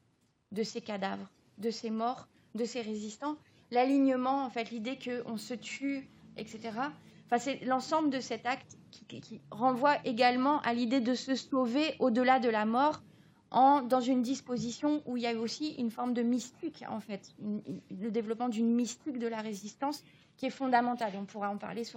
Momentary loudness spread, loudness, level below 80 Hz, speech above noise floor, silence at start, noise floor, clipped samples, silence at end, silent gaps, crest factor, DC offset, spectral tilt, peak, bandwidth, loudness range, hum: 14 LU; -32 LUFS; -82 dBFS; 40 dB; 0.5 s; -72 dBFS; under 0.1%; 0.05 s; none; 20 dB; under 0.1%; -4.5 dB/octave; -14 dBFS; 16 kHz; 7 LU; none